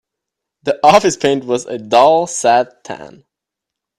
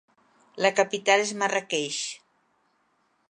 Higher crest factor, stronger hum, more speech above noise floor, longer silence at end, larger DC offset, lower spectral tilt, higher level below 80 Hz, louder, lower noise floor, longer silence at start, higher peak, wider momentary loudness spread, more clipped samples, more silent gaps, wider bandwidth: second, 16 dB vs 22 dB; neither; first, 68 dB vs 45 dB; second, 0.9 s vs 1.15 s; neither; first, -3.5 dB/octave vs -2 dB/octave; first, -54 dBFS vs -82 dBFS; first, -13 LUFS vs -25 LUFS; first, -82 dBFS vs -70 dBFS; about the same, 0.65 s vs 0.55 s; first, 0 dBFS vs -6 dBFS; first, 17 LU vs 10 LU; neither; neither; first, 13 kHz vs 11 kHz